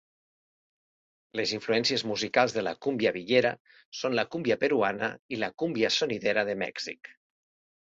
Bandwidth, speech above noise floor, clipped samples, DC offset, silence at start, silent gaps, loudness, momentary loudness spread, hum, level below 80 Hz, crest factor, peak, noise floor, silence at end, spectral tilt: 8 kHz; over 62 dB; under 0.1%; under 0.1%; 1.35 s; 3.60-3.65 s, 3.85-3.92 s, 5.19-5.29 s; -28 LUFS; 9 LU; none; -70 dBFS; 20 dB; -8 dBFS; under -90 dBFS; 0.7 s; -4 dB/octave